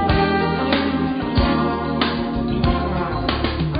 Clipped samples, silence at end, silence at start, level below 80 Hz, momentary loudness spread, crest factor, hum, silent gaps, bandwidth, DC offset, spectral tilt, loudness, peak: under 0.1%; 0 s; 0 s; -28 dBFS; 4 LU; 16 dB; none; none; 5.2 kHz; under 0.1%; -11.5 dB/octave; -20 LUFS; -4 dBFS